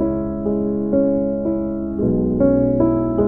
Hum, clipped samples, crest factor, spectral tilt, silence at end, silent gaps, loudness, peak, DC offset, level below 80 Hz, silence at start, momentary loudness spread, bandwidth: none; under 0.1%; 14 dB; -13.5 dB/octave; 0 s; none; -19 LUFS; -4 dBFS; under 0.1%; -36 dBFS; 0 s; 6 LU; 2.5 kHz